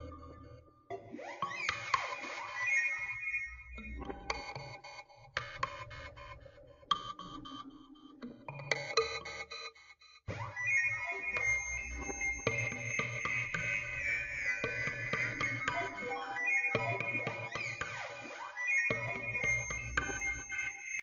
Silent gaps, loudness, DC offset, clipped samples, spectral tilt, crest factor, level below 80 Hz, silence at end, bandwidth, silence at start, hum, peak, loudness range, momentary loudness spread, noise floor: none; -35 LUFS; under 0.1%; under 0.1%; -2 dB/octave; 24 dB; -56 dBFS; 0 s; 7.6 kHz; 0 s; none; -14 dBFS; 8 LU; 17 LU; -60 dBFS